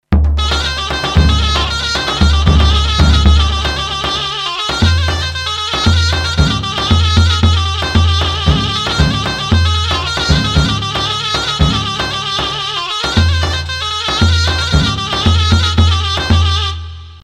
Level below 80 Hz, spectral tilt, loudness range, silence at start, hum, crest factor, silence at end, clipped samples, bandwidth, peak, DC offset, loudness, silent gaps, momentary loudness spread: -18 dBFS; -4.5 dB/octave; 2 LU; 0.1 s; none; 12 dB; 0.05 s; under 0.1%; 11 kHz; 0 dBFS; under 0.1%; -13 LUFS; none; 6 LU